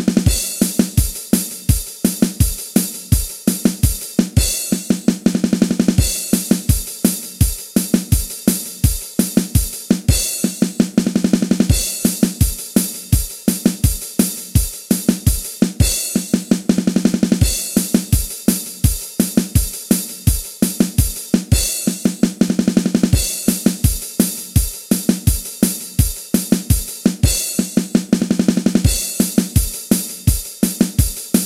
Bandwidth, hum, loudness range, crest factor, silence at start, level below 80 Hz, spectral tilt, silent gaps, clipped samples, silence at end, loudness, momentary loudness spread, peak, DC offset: 16.5 kHz; none; 1 LU; 16 dB; 0 s; -26 dBFS; -5 dB/octave; none; under 0.1%; 0 s; -17 LUFS; 3 LU; 0 dBFS; under 0.1%